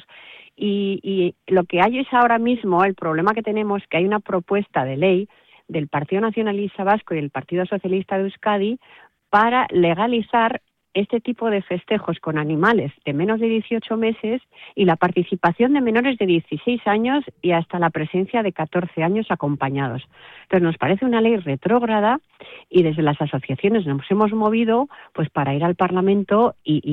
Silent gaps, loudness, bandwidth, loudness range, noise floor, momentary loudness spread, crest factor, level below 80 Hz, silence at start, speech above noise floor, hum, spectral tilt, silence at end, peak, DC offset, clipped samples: none; -20 LUFS; 5 kHz; 3 LU; -45 dBFS; 7 LU; 14 dB; -60 dBFS; 0.15 s; 25 dB; none; -9 dB/octave; 0 s; -6 dBFS; under 0.1%; under 0.1%